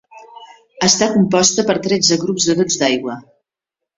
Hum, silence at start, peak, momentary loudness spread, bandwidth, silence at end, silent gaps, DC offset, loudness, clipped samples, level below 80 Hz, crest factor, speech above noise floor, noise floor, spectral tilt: none; 0.15 s; 0 dBFS; 7 LU; 8 kHz; 0.75 s; none; under 0.1%; -15 LUFS; under 0.1%; -56 dBFS; 18 dB; 68 dB; -83 dBFS; -3 dB/octave